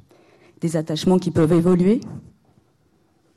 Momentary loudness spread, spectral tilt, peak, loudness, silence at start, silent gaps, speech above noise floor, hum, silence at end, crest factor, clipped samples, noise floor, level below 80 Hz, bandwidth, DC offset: 14 LU; -7.5 dB/octave; -8 dBFS; -19 LUFS; 0.65 s; none; 43 dB; none; 1.15 s; 14 dB; under 0.1%; -61 dBFS; -50 dBFS; 12.5 kHz; under 0.1%